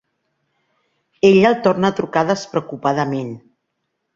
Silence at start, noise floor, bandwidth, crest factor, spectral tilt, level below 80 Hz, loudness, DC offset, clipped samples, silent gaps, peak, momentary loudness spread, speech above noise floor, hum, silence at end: 1.25 s; -74 dBFS; 7.6 kHz; 18 dB; -6 dB/octave; -58 dBFS; -17 LUFS; under 0.1%; under 0.1%; none; -2 dBFS; 13 LU; 58 dB; none; 0.75 s